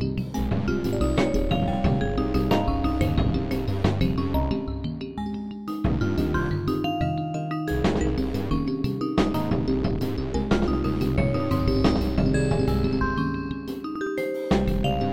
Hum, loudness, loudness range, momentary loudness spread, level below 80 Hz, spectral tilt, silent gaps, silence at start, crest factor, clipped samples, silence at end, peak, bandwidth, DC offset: none; -25 LUFS; 3 LU; 6 LU; -32 dBFS; -7.5 dB/octave; none; 0 s; 18 dB; under 0.1%; 0 s; -8 dBFS; 16.5 kHz; 1%